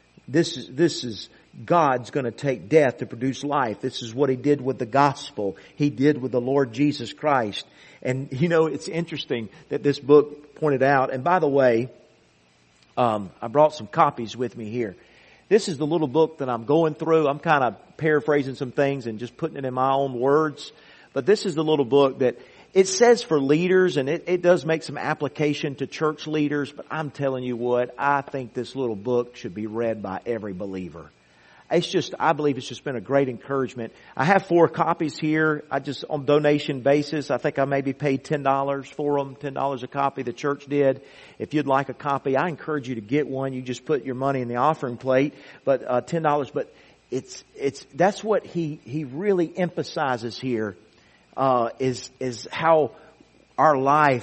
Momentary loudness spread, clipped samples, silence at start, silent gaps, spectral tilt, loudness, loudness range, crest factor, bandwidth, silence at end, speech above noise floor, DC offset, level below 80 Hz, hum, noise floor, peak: 11 LU; under 0.1%; 0.3 s; none; -6 dB/octave; -23 LUFS; 5 LU; 20 dB; 8.4 kHz; 0 s; 36 dB; under 0.1%; -64 dBFS; none; -59 dBFS; -2 dBFS